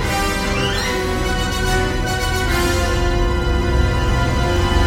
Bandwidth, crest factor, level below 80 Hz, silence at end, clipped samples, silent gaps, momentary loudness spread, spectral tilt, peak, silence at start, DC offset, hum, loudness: 16.5 kHz; 14 dB; -22 dBFS; 0 s; under 0.1%; none; 2 LU; -4.5 dB/octave; -4 dBFS; 0 s; under 0.1%; none; -19 LUFS